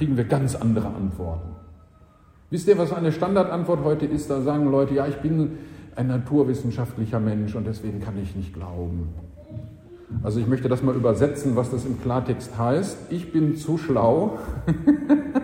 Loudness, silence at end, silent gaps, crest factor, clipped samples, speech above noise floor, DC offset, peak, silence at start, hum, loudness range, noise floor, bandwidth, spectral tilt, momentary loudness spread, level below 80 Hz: -24 LUFS; 0 s; none; 18 dB; under 0.1%; 30 dB; under 0.1%; -6 dBFS; 0 s; none; 6 LU; -52 dBFS; 16 kHz; -8 dB/octave; 12 LU; -44 dBFS